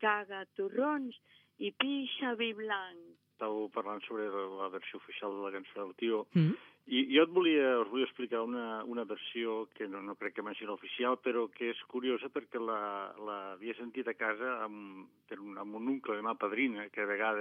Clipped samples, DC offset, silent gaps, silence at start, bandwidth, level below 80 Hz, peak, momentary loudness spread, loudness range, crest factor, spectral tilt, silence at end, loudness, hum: under 0.1%; under 0.1%; none; 0 s; 4.7 kHz; under -90 dBFS; -14 dBFS; 12 LU; 8 LU; 22 dB; -8.5 dB/octave; 0 s; -36 LUFS; none